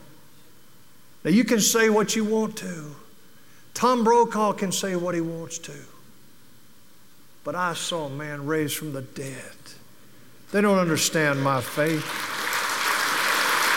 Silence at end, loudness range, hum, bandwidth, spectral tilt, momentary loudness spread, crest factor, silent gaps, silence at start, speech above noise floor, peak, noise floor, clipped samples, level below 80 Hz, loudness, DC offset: 0 s; 9 LU; none; 17 kHz; -3.5 dB/octave; 16 LU; 18 dB; none; 1.25 s; 32 dB; -8 dBFS; -55 dBFS; under 0.1%; -70 dBFS; -23 LUFS; 0.5%